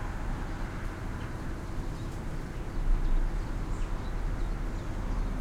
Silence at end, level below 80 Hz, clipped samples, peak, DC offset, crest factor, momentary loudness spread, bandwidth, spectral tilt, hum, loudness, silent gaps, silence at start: 0 s; -32 dBFS; under 0.1%; -16 dBFS; under 0.1%; 14 dB; 5 LU; 10 kHz; -6.5 dB/octave; none; -37 LUFS; none; 0 s